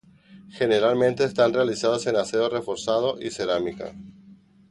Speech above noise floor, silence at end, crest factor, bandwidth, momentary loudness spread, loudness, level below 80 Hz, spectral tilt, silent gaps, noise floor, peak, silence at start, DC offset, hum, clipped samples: 29 dB; 0.4 s; 18 dB; 11.5 kHz; 8 LU; -23 LUFS; -60 dBFS; -4.5 dB/octave; none; -52 dBFS; -6 dBFS; 0.3 s; under 0.1%; none; under 0.1%